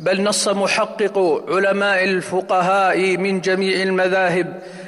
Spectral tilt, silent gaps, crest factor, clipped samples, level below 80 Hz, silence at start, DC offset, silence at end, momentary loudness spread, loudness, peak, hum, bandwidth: -4 dB/octave; none; 10 dB; under 0.1%; -66 dBFS; 0 s; under 0.1%; 0 s; 3 LU; -18 LUFS; -8 dBFS; none; 15 kHz